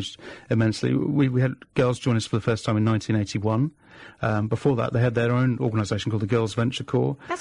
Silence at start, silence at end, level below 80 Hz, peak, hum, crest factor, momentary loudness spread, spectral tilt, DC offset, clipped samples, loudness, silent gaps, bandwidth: 0 s; 0 s; -54 dBFS; -10 dBFS; none; 14 dB; 4 LU; -7 dB/octave; under 0.1%; under 0.1%; -24 LUFS; none; 10.5 kHz